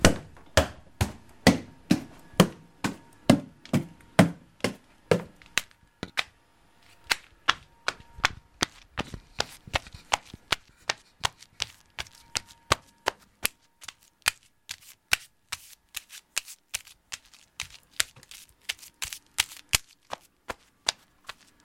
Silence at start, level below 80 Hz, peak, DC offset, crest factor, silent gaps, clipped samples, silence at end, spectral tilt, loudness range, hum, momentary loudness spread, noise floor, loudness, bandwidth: 0 s; -48 dBFS; -2 dBFS; under 0.1%; 30 dB; none; under 0.1%; 0.7 s; -3.5 dB/octave; 8 LU; none; 18 LU; -62 dBFS; -30 LUFS; 16.5 kHz